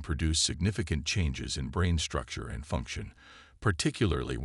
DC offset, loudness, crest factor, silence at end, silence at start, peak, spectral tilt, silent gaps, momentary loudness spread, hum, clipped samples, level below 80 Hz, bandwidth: under 0.1%; -31 LUFS; 16 dB; 0 s; 0 s; -14 dBFS; -4 dB/octave; none; 11 LU; none; under 0.1%; -42 dBFS; 12 kHz